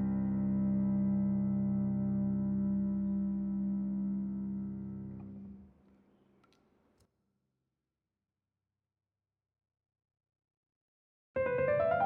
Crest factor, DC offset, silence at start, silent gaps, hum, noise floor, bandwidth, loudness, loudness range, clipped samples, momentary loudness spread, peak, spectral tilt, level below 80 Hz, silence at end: 16 dB; under 0.1%; 0 s; 10.57-10.63 s, 10.76-11.34 s; none; under -90 dBFS; 3.5 kHz; -34 LUFS; 16 LU; under 0.1%; 12 LU; -20 dBFS; -10 dB/octave; -60 dBFS; 0 s